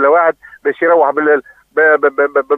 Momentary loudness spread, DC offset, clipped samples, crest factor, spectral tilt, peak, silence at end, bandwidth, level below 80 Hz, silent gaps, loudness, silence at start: 9 LU; under 0.1%; under 0.1%; 12 dB; -7 dB/octave; 0 dBFS; 0 s; 3.9 kHz; -64 dBFS; none; -13 LUFS; 0 s